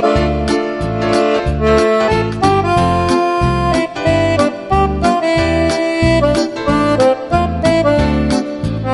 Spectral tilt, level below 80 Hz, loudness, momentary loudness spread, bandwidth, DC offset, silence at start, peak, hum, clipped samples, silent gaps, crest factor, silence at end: -6.5 dB/octave; -26 dBFS; -14 LUFS; 4 LU; 11.5 kHz; under 0.1%; 0 s; 0 dBFS; none; under 0.1%; none; 12 dB; 0 s